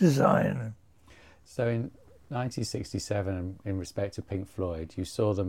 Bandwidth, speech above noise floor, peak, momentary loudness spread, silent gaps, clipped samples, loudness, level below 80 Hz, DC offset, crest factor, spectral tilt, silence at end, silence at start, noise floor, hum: 16.5 kHz; 28 dB; -8 dBFS; 12 LU; none; under 0.1%; -31 LUFS; -54 dBFS; 0.1%; 22 dB; -6.5 dB/octave; 0 s; 0 s; -57 dBFS; none